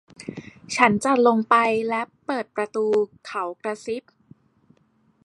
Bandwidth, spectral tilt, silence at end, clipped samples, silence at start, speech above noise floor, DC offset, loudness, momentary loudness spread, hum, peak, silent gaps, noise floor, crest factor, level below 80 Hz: 11.5 kHz; -4.5 dB/octave; 1.25 s; under 0.1%; 0.2 s; 41 dB; under 0.1%; -22 LUFS; 15 LU; none; 0 dBFS; none; -63 dBFS; 22 dB; -66 dBFS